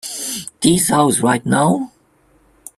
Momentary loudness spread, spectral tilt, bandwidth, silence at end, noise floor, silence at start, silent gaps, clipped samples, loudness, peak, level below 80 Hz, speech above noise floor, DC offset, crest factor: 10 LU; -4 dB/octave; 15.5 kHz; 0.9 s; -55 dBFS; 0.05 s; none; under 0.1%; -16 LUFS; 0 dBFS; -52 dBFS; 40 dB; under 0.1%; 16 dB